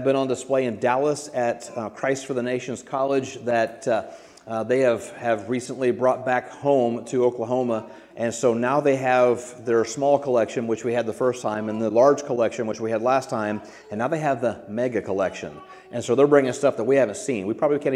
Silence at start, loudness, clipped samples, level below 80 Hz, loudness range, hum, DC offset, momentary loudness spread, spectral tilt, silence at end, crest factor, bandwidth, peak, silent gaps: 0 s; -23 LUFS; under 0.1%; -68 dBFS; 3 LU; none; under 0.1%; 10 LU; -5.5 dB/octave; 0 s; 20 dB; 12.5 kHz; -2 dBFS; none